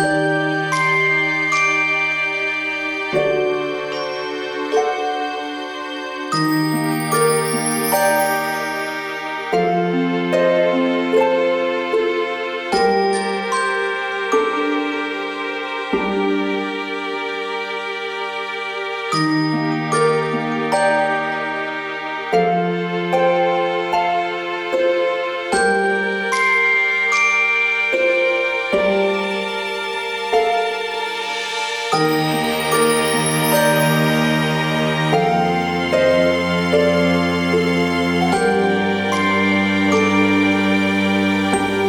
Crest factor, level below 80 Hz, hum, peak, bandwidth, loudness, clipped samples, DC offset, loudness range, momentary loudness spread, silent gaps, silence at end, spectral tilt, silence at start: 16 dB; -54 dBFS; none; -2 dBFS; over 20 kHz; -18 LUFS; under 0.1%; under 0.1%; 5 LU; 8 LU; none; 0 s; -4.5 dB/octave; 0 s